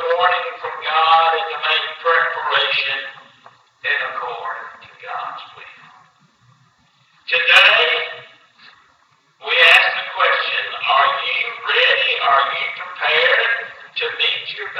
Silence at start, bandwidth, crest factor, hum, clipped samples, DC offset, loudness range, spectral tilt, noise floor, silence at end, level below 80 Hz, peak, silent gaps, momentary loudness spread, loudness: 0 s; 15 kHz; 18 dB; none; under 0.1%; under 0.1%; 13 LU; 0 dB/octave; -57 dBFS; 0 s; -70 dBFS; 0 dBFS; none; 18 LU; -15 LUFS